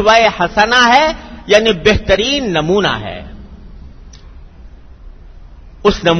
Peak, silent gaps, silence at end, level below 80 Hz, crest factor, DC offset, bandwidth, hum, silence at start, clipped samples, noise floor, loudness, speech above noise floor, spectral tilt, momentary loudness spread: 0 dBFS; none; 0 s; -32 dBFS; 14 dB; under 0.1%; 11 kHz; none; 0 s; under 0.1%; -36 dBFS; -12 LUFS; 24 dB; -4 dB/octave; 11 LU